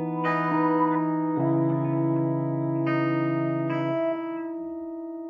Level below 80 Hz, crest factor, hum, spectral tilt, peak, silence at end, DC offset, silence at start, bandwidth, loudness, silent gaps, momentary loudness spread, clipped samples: -74 dBFS; 14 dB; none; -10.5 dB/octave; -12 dBFS; 0 s; under 0.1%; 0 s; 4.9 kHz; -26 LUFS; none; 10 LU; under 0.1%